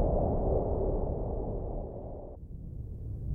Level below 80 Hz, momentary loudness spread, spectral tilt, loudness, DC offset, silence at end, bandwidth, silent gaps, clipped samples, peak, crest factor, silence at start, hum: -36 dBFS; 15 LU; -14 dB/octave; -35 LUFS; under 0.1%; 0 s; 1.8 kHz; none; under 0.1%; -18 dBFS; 14 dB; 0 s; none